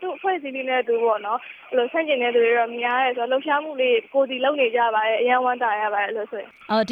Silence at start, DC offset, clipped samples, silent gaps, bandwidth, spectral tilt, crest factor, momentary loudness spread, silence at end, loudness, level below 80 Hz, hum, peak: 0 s; under 0.1%; under 0.1%; none; 5 kHz; -5 dB/octave; 16 dB; 7 LU; 0 s; -22 LUFS; -78 dBFS; none; -6 dBFS